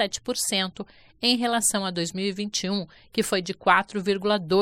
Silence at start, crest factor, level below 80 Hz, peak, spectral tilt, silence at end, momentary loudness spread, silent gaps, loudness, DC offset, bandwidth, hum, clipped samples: 0 s; 22 dB; -60 dBFS; -4 dBFS; -3 dB/octave; 0 s; 9 LU; none; -25 LUFS; under 0.1%; 17 kHz; none; under 0.1%